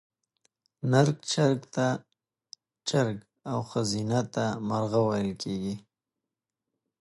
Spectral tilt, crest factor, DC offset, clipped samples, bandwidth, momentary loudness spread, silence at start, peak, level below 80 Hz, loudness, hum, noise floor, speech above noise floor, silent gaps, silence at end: -5.5 dB/octave; 20 dB; under 0.1%; under 0.1%; 11.5 kHz; 11 LU; 0.85 s; -8 dBFS; -64 dBFS; -28 LUFS; none; -88 dBFS; 61 dB; none; 1.2 s